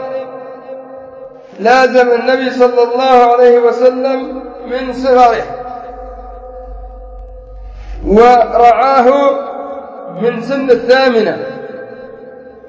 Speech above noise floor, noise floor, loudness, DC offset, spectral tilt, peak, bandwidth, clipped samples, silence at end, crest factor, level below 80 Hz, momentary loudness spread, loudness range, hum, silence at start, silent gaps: 24 dB; -33 dBFS; -10 LUFS; under 0.1%; -5.5 dB/octave; 0 dBFS; 7.6 kHz; 0.6%; 0.15 s; 12 dB; -36 dBFS; 23 LU; 6 LU; none; 0 s; none